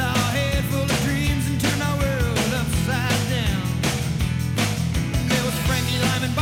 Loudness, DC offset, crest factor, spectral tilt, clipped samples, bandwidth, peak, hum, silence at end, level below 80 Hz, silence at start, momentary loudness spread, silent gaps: -22 LUFS; under 0.1%; 12 dB; -4.5 dB/octave; under 0.1%; 17 kHz; -10 dBFS; none; 0 s; -32 dBFS; 0 s; 2 LU; none